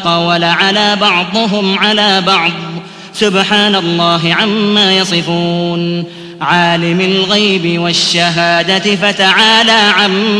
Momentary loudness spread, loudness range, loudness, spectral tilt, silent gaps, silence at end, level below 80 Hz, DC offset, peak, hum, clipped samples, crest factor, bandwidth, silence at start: 8 LU; 3 LU; -10 LUFS; -4 dB/octave; none; 0 s; -52 dBFS; under 0.1%; 0 dBFS; none; 0.3%; 12 dB; 11 kHz; 0 s